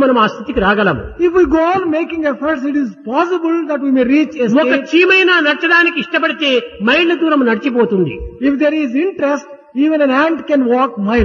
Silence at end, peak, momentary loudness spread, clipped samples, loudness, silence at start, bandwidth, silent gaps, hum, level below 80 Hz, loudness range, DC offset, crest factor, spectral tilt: 0 s; 0 dBFS; 7 LU; under 0.1%; -13 LUFS; 0 s; 7.2 kHz; none; none; -38 dBFS; 3 LU; under 0.1%; 14 dB; -6 dB/octave